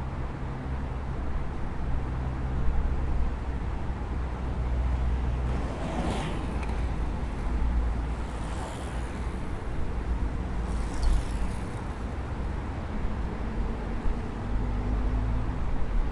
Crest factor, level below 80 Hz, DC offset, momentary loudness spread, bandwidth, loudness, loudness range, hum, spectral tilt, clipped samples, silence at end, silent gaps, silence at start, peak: 16 dB; -30 dBFS; under 0.1%; 5 LU; 11 kHz; -33 LUFS; 2 LU; none; -7 dB/octave; under 0.1%; 0 s; none; 0 s; -12 dBFS